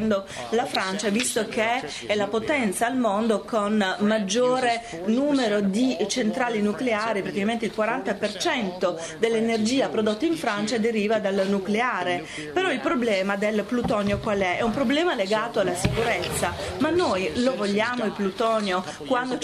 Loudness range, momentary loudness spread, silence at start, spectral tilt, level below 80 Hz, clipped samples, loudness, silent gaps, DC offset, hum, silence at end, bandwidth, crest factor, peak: 1 LU; 4 LU; 0 s; -4.5 dB/octave; -50 dBFS; under 0.1%; -24 LUFS; none; under 0.1%; none; 0 s; 13.5 kHz; 16 dB; -8 dBFS